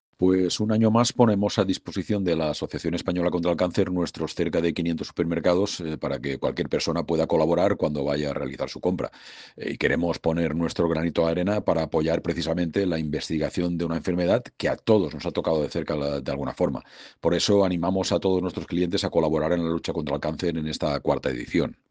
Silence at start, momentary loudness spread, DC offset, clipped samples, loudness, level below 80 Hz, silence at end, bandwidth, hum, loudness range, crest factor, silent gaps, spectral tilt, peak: 0.2 s; 7 LU; under 0.1%; under 0.1%; -25 LUFS; -48 dBFS; 0.15 s; 9.8 kHz; none; 2 LU; 22 dB; none; -6 dB/octave; -4 dBFS